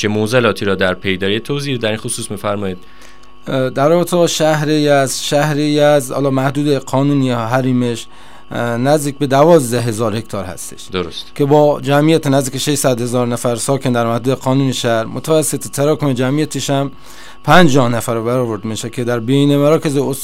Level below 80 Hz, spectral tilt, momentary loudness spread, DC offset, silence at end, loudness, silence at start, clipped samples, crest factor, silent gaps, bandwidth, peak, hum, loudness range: -48 dBFS; -5 dB/octave; 10 LU; 2%; 0 s; -15 LUFS; 0 s; under 0.1%; 14 dB; none; 16 kHz; 0 dBFS; none; 3 LU